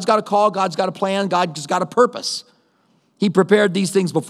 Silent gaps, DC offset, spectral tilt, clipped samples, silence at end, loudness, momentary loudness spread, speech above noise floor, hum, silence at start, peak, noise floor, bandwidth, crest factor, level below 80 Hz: none; under 0.1%; -5 dB/octave; under 0.1%; 0 s; -18 LUFS; 7 LU; 43 dB; none; 0 s; 0 dBFS; -61 dBFS; 13.5 kHz; 18 dB; -76 dBFS